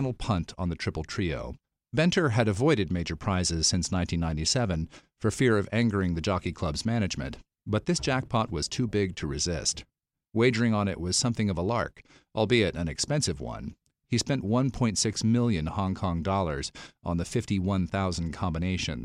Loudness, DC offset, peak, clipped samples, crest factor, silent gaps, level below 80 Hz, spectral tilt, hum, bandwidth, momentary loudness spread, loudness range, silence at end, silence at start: -28 LUFS; under 0.1%; -10 dBFS; under 0.1%; 18 dB; none; -46 dBFS; -5 dB/octave; none; 12 kHz; 9 LU; 2 LU; 0 s; 0 s